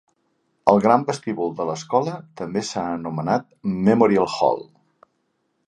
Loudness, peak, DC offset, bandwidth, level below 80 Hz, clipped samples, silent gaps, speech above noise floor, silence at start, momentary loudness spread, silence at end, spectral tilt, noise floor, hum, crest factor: -21 LUFS; 0 dBFS; under 0.1%; 9.8 kHz; -60 dBFS; under 0.1%; none; 50 dB; 0.65 s; 11 LU; 1.05 s; -6.5 dB/octave; -71 dBFS; none; 22 dB